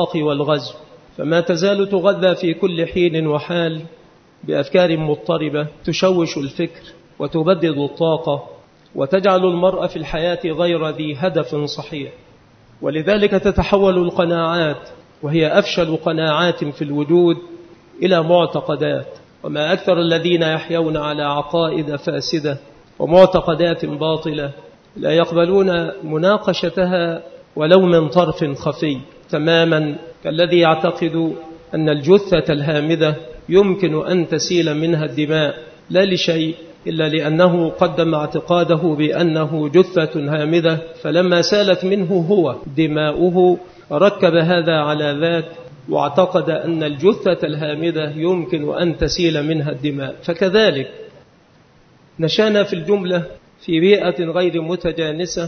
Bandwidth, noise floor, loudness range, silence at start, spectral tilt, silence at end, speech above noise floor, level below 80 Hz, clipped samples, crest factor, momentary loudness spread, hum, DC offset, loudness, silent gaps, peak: 6.6 kHz; -51 dBFS; 3 LU; 0 s; -6 dB/octave; 0 s; 34 dB; -44 dBFS; under 0.1%; 18 dB; 10 LU; none; under 0.1%; -17 LUFS; none; 0 dBFS